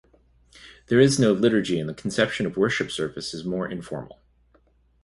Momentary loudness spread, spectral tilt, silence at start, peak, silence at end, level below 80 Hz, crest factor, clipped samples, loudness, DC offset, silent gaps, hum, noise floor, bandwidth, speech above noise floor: 13 LU; -5 dB/octave; 0.6 s; -4 dBFS; 1 s; -56 dBFS; 20 dB; under 0.1%; -23 LUFS; under 0.1%; none; none; -61 dBFS; 11.5 kHz; 38 dB